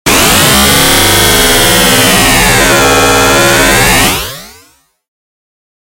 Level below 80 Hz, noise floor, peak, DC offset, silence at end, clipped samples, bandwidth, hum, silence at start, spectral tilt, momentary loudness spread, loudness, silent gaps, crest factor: -22 dBFS; -46 dBFS; 0 dBFS; under 0.1%; 1.5 s; 0.4%; over 20 kHz; none; 0.05 s; -2.5 dB/octave; 1 LU; -5 LUFS; none; 8 dB